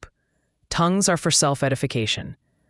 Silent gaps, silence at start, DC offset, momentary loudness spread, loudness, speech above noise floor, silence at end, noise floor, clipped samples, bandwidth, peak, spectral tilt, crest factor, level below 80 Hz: none; 0 s; under 0.1%; 10 LU; -21 LUFS; 49 dB; 0.35 s; -70 dBFS; under 0.1%; 12 kHz; -4 dBFS; -3.5 dB/octave; 20 dB; -50 dBFS